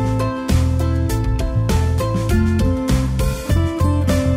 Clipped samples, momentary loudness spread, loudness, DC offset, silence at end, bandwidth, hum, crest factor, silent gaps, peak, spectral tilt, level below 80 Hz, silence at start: under 0.1%; 3 LU; -19 LUFS; under 0.1%; 0 s; 16 kHz; none; 10 dB; none; -6 dBFS; -7 dB/octave; -22 dBFS; 0 s